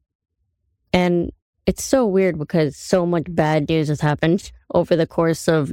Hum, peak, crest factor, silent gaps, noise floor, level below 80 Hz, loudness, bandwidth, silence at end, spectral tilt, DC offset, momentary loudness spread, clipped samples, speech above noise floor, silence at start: none; -2 dBFS; 16 dB; 1.42-1.53 s; -71 dBFS; -44 dBFS; -20 LUFS; 17 kHz; 0 s; -6 dB/octave; under 0.1%; 5 LU; under 0.1%; 52 dB; 0.95 s